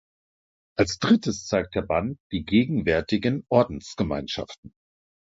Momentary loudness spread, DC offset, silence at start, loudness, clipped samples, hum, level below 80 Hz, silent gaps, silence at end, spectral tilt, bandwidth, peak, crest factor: 11 LU; under 0.1%; 0.8 s; -25 LUFS; under 0.1%; none; -46 dBFS; 2.20-2.30 s, 4.58-4.63 s; 0.7 s; -5.5 dB/octave; 7.8 kHz; -4 dBFS; 20 dB